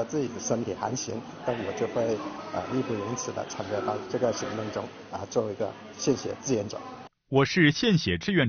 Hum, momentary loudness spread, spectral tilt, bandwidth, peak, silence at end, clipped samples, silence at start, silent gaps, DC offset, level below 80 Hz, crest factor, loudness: none; 11 LU; -4.5 dB/octave; 7 kHz; -8 dBFS; 0 s; under 0.1%; 0 s; none; under 0.1%; -60 dBFS; 20 dB; -29 LUFS